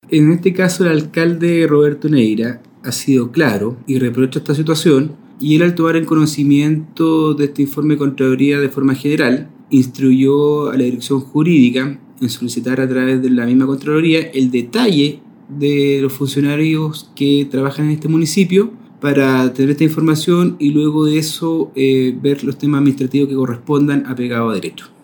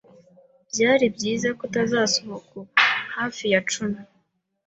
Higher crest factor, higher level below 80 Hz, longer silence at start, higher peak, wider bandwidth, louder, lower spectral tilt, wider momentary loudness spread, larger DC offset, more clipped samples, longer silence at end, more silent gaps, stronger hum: second, 14 dB vs 20 dB; about the same, -64 dBFS vs -64 dBFS; second, 0.1 s vs 0.75 s; first, 0 dBFS vs -4 dBFS; first, 19.5 kHz vs 8.4 kHz; first, -15 LUFS vs -22 LUFS; first, -6.5 dB/octave vs -3 dB/octave; second, 7 LU vs 12 LU; neither; neither; second, 0.2 s vs 0.65 s; neither; neither